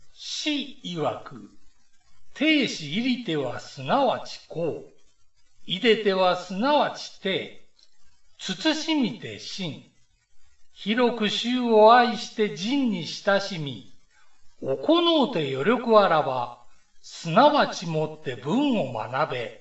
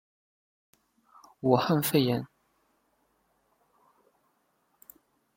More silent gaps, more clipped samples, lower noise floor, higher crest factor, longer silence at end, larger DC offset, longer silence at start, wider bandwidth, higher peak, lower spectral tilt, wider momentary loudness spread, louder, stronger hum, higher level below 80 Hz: neither; neither; second, -57 dBFS vs -73 dBFS; second, 20 dB vs 26 dB; second, 0.05 s vs 3.1 s; first, 0.3% vs under 0.1%; second, 0 s vs 1.45 s; second, 8.2 kHz vs 16.5 kHz; first, -4 dBFS vs -8 dBFS; about the same, -5 dB/octave vs -5.5 dB/octave; first, 16 LU vs 9 LU; first, -24 LUFS vs -27 LUFS; neither; first, -64 dBFS vs -70 dBFS